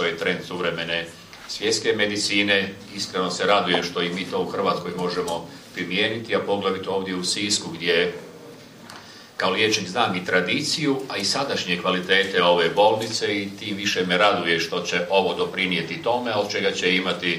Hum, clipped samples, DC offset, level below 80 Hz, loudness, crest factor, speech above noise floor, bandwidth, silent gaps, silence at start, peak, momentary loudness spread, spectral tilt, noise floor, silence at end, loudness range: none; under 0.1%; under 0.1%; -64 dBFS; -22 LUFS; 20 dB; 20 dB; 15.5 kHz; none; 0 s; -4 dBFS; 11 LU; -3 dB/octave; -43 dBFS; 0 s; 4 LU